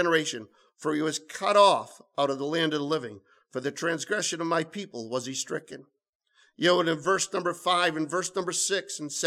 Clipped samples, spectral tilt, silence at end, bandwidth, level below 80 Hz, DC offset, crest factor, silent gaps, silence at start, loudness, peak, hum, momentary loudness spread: under 0.1%; -3 dB/octave; 0 s; 15.5 kHz; -80 dBFS; under 0.1%; 20 dB; 6.09-6.20 s; 0 s; -27 LUFS; -8 dBFS; none; 13 LU